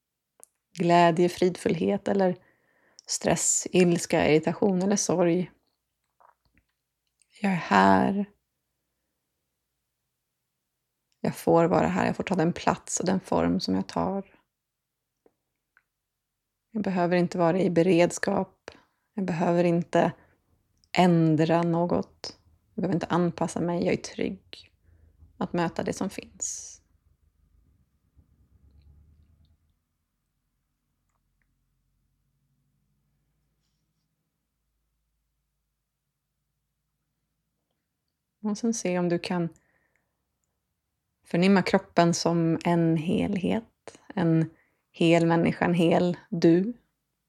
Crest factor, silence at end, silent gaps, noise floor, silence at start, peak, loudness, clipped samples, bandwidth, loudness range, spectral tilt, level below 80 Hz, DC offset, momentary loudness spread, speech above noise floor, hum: 22 dB; 0.55 s; none; -84 dBFS; 0.75 s; -4 dBFS; -25 LUFS; under 0.1%; 13.5 kHz; 10 LU; -5.5 dB/octave; -62 dBFS; under 0.1%; 12 LU; 59 dB; none